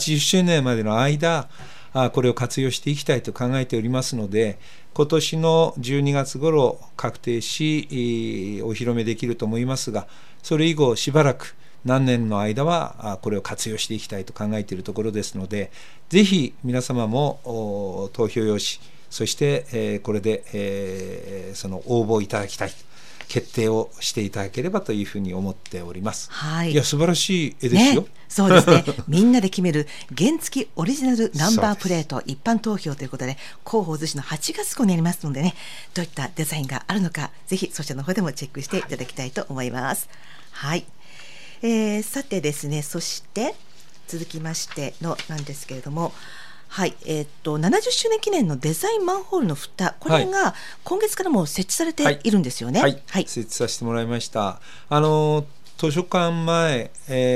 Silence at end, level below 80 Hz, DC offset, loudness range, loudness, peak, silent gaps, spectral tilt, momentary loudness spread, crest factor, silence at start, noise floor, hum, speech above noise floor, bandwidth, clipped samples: 0 s; -60 dBFS; 2%; 8 LU; -23 LUFS; 0 dBFS; none; -5 dB/octave; 12 LU; 22 dB; 0 s; -45 dBFS; none; 23 dB; 16 kHz; under 0.1%